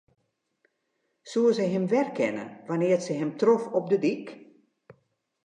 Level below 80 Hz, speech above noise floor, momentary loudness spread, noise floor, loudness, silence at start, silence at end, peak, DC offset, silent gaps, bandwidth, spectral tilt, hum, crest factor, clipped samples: -80 dBFS; 51 dB; 9 LU; -77 dBFS; -26 LUFS; 1.25 s; 1.05 s; -10 dBFS; under 0.1%; none; 10 kHz; -6.5 dB/octave; none; 18 dB; under 0.1%